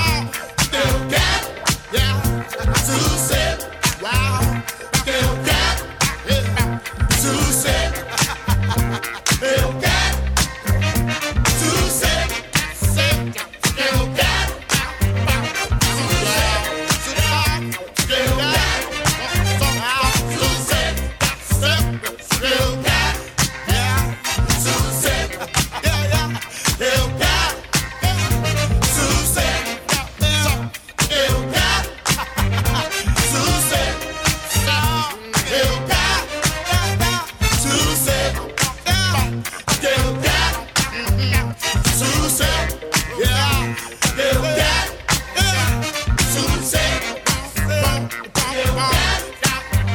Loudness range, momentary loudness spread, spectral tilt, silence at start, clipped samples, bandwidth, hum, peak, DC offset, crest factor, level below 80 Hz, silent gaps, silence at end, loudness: 1 LU; 4 LU; -3.5 dB/octave; 0 s; under 0.1%; 19 kHz; none; -4 dBFS; under 0.1%; 16 dB; -26 dBFS; none; 0 s; -18 LUFS